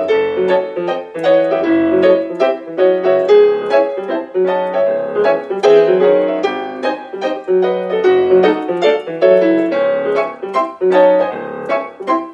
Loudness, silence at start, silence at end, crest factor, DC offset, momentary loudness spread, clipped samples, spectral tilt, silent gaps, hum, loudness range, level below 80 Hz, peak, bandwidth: -14 LUFS; 0 s; 0 s; 14 dB; under 0.1%; 10 LU; under 0.1%; -6.5 dB/octave; none; none; 1 LU; -68 dBFS; 0 dBFS; 7.6 kHz